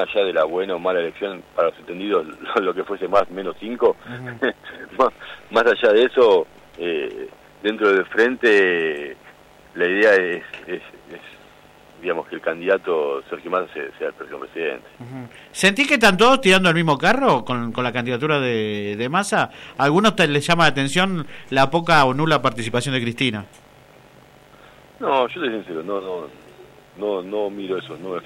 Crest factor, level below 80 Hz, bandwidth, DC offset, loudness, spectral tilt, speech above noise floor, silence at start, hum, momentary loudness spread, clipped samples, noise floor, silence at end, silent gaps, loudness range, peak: 16 dB; -54 dBFS; 15.5 kHz; under 0.1%; -20 LUFS; -4.5 dB/octave; 28 dB; 0 s; none; 17 LU; under 0.1%; -48 dBFS; 0 s; none; 9 LU; -4 dBFS